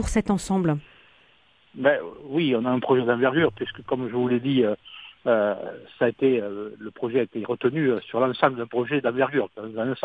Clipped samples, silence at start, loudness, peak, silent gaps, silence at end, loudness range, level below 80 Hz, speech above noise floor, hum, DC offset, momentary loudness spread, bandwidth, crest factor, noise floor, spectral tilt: under 0.1%; 0 s; -24 LUFS; -4 dBFS; none; 0 s; 2 LU; -48 dBFS; 36 dB; none; under 0.1%; 11 LU; 11 kHz; 20 dB; -60 dBFS; -6.5 dB/octave